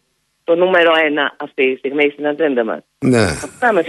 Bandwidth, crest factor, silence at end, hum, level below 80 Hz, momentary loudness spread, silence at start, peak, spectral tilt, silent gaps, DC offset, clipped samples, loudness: 12 kHz; 14 dB; 0 s; none; -46 dBFS; 8 LU; 0.5 s; -2 dBFS; -5 dB/octave; none; under 0.1%; under 0.1%; -15 LUFS